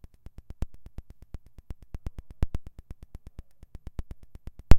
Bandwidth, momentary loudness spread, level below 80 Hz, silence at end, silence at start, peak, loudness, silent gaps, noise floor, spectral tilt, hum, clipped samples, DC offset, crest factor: 7 kHz; 16 LU; -34 dBFS; 0 s; 0.6 s; 0 dBFS; -44 LUFS; none; -47 dBFS; -7 dB/octave; none; under 0.1%; under 0.1%; 26 dB